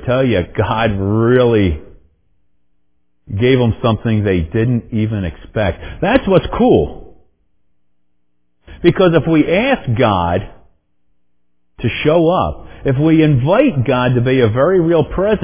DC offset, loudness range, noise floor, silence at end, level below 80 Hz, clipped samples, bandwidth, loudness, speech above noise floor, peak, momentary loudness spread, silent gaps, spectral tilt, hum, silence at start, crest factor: under 0.1%; 4 LU; -69 dBFS; 0 s; -32 dBFS; under 0.1%; 4 kHz; -14 LUFS; 56 dB; 0 dBFS; 8 LU; none; -11.5 dB/octave; 60 Hz at -40 dBFS; 0 s; 14 dB